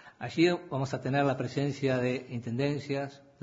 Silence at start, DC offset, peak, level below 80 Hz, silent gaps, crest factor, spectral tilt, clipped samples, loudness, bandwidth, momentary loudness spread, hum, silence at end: 0.05 s; under 0.1%; -12 dBFS; -68 dBFS; none; 18 dB; -6.5 dB/octave; under 0.1%; -31 LUFS; 7.8 kHz; 9 LU; none; 0.2 s